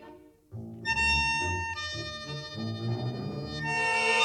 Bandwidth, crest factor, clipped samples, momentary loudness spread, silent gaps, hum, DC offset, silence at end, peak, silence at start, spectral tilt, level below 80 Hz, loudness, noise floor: 11.5 kHz; 16 dB; under 0.1%; 13 LU; none; none; under 0.1%; 0 s; -14 dBFS; 0 s; -3.5 dB/octave; -48 dBFS; -29 LUFS; -52 dBFS